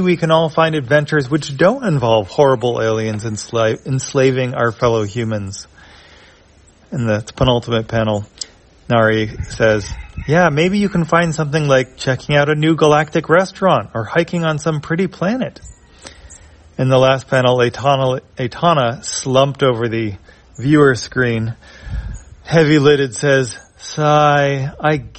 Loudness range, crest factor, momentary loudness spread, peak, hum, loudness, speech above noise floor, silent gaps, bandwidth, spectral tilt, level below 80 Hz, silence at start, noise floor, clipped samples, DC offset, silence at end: 5 LU; 16 dB; 12 LU; 0 dBFS; none; -15 LUFS; 33 dB; none; 8.8 kHz; -5.5 dB/octave; -40 dBFS; 0 s; -48 dBFS; under 0.1%; under 0.1%; 0 s